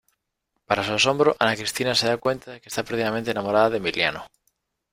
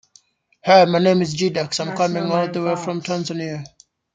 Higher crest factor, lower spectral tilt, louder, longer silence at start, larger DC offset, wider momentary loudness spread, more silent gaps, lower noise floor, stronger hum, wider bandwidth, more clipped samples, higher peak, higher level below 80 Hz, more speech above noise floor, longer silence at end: about the same, 22 dB vs 18 dB; second, -3.5 dB/octave vs -5 dB/octave; second, -23 LUFS vs -19 LUFS; about the same, 0.7 s vs 0.65 s; neither; second, 9 LU vs 14 LU; neither; first, -78 dBFS vs -56 dBFS; neither; first, 16 kHz vs 9.4 kHz; neither; about the same, -2 dBFS vs -2 dBFS; about the same, -58 dBFS vs -62 dBFS; first, 55 dB vs 37 dB; first, 0.65 s vs 0.5 s